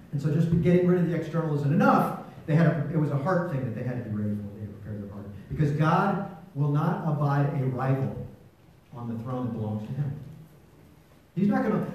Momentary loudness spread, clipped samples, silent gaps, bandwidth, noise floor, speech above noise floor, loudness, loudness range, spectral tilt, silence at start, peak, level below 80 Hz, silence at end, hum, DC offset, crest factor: 16 LU; under 0.1%; none; 14 kHz; -55 dBFS; 30 dB; -26 LUFS; 8 LU; -9 dB/octave; 0 s; -6 dBFS; -56 dBFS; 0 s; none; under 0.1%; 20 dB